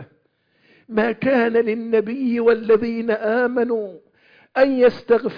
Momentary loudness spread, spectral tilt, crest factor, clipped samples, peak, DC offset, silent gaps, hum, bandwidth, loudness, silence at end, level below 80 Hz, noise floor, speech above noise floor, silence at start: 7 LU; -8 dB/octave; 16 dB; under 0.1%; -4 dBFS; under 0.1%; none; none; 5.2 kHz; -19 LUFS; 0 s; -60 dBFS; -64 dBFS; 45 dB; 0 s